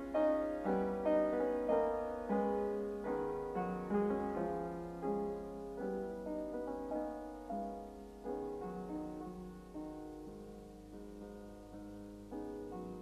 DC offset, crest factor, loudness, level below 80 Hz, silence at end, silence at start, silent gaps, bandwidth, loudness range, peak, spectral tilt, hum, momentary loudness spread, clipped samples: under 0.1%; 18 dB; -39 LUFS; -60 dBFS; 0 s; 0 s; none; 13.5 kHz; 13 LU; -20 dBFS; -8 dB/octave; none; 16 LU; under 0.1%